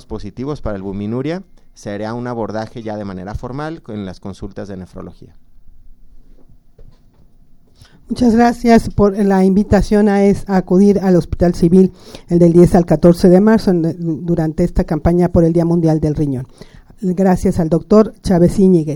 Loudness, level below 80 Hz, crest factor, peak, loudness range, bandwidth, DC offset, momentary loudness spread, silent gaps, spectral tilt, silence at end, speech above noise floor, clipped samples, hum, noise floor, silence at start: -14 LUFS; -32 dBFS; 14 dB; 0 dBFS; 16 LU; 16 kHz; under 0.1%; 17 LU; none; -8.5 dB/octave; 0 s; 31 dB; under 0.1%; none; -45 dBFS; 0.1 s